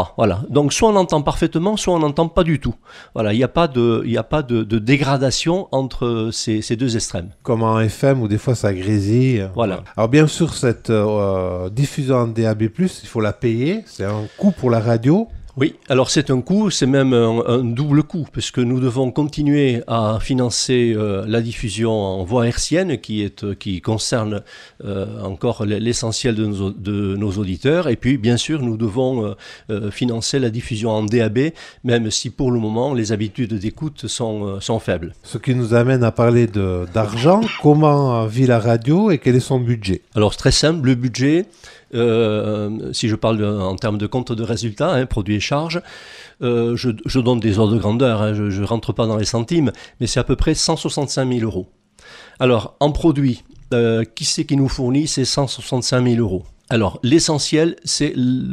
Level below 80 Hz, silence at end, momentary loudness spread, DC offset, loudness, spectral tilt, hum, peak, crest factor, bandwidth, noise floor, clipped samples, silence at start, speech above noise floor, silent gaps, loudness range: -38 dBFS; 0 s; 8 LU; under 0.1%; -18 LUFS; -5.5 dB/octave; none; 0 dBFS; 18 dB; 12.5 kHz; -43 dBFS; under 0.1%; 0 s; 26 dB; none; 5 LU